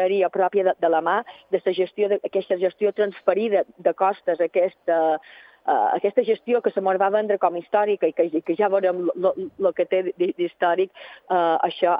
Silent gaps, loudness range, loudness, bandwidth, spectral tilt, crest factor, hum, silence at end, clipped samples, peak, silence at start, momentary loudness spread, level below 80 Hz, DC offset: none; 1 LU; -22 LUFS; 5 kHz; -8.5 dB/octave; 18 dB; none; 0 s; under 0.1%; -4 dBFS; 0 s; 4 LU; -78 dBFS; under 0.1%